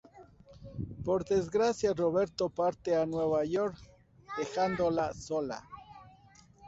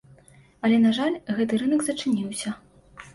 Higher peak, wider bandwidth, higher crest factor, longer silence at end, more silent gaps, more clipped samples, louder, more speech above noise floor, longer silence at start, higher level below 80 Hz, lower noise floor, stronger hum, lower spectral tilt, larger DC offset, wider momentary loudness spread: second, -18 dBFS vs -10 dBFS; second, 8 kHz vs 11.5 kHz; about the same, 14 dB vs 14 dB; about the same, 0 s vs 0.05 s; neither; neither; second, -32 LUFS vs -24 LUFS; about the same, 29 dB vs 31 dB; second, 0.15 s vs 0.65 s; about the same, -58 dBFS vs -62 dBFS; first, -59 dBFS vs -54 dBFS; neither; first, -6 dB/octave vs -4.5 dB/octave; neither; about the same, 13 LU vs 11 LU